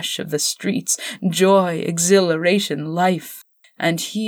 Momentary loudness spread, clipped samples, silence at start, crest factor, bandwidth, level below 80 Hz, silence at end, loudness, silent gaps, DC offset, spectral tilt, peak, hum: 8 LU; under 0.1%; 0 s; 16 dB; over 20 kHz; -70 dBFS; 0 s; -19 LUFS; none; under 0.1%; -4 dB/octave; -4 dBFS; none